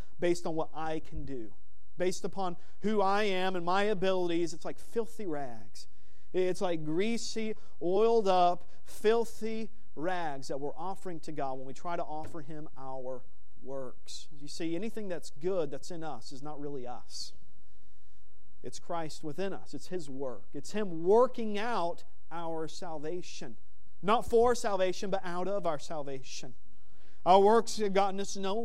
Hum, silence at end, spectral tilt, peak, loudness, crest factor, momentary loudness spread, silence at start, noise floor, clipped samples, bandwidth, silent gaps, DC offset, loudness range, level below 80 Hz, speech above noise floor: none; 0 s; -5 dB/octave; -10 dBFS; -33 LUFS; 24 dB; 18 LU; 0.2 s; -66 dBFS; under 0.1%; 14 kHz; none; 3%; 11 LU; -60 dBFS; 33 dB